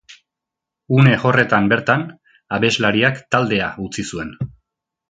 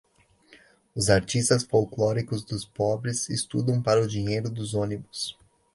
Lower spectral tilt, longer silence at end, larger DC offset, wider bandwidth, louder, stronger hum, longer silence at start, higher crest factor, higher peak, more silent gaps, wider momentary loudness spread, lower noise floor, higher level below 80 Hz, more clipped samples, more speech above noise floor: about the same, -6 dB/octave vs -5 dB/octave; first, 0.65 s vs 0.45 s; neither; second, 9.2 kHz vs 11.5 kHz; first, -17 LUFS vs -26 LUFS; neither; second, 0.1 s vs 0.5 s; about the same, 18 dB vs 22 dB; first, 0 dBFS vs -6 dBFS; neither; first, 14 LU vs 10 LU; first, -84 dBFS vs -59 dBFS; about the same, -50 dBFS vs -52 dBFS; neither; first, 67 dB vs 34 dB